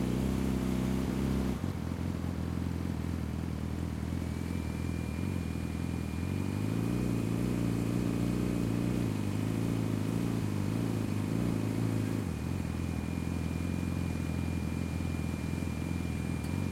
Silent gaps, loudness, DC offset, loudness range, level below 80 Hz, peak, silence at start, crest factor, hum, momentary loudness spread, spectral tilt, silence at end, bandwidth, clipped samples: none; -34 LUFS; under 0.1%; 4 LU; -46 dBFS; -18 dBFS; 0 s; 14 dB; none; 4 LU; -7 dB/octave; 0 s; 16.5 kHz; under 0.1%